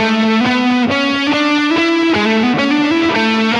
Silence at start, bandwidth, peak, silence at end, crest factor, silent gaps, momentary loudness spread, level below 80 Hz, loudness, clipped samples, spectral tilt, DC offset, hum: 0 s; 10.5 kHz; -2 dBFS; 0 s; 12 dB; none; 1 LU; -54 dBFS; -13 LUFS; under 0.1%; -4.5 dB/octave; under 0.1%; none